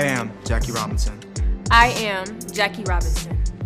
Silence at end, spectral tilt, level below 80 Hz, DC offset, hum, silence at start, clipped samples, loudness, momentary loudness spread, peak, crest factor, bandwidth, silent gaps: 0 s; -4 dB/octave; -26 dBFS; under 0.1%; none; 0 s; under 0.1%; -21 LUFS; 12 LU; 0 dBFS; 20 dB; 15.5 kHz; none